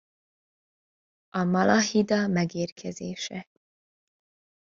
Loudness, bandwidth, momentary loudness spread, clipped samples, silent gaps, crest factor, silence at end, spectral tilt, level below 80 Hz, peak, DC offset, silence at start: -26 LUFS; 7.6 kHz; 14 LU; under 0.1%; 2.72-2.76 s; 22 dB; 1.2 s; -5 dB/octave; -66 dBFS; -6 dBFS; under 0.1%; 1.35 s